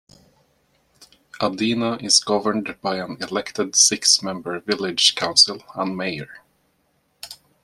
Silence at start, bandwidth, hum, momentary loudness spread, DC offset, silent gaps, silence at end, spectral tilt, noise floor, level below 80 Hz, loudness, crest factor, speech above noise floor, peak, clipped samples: 1.35 s; 14.5 kHz; none; 16 LU; under 0.1%; none; 0.3 s; -1.5 dB/octave; -66 dBFS; -64 dBFS; -19 LUFS; 22 dB; 45 dB; 0 dBFS; under 0.1%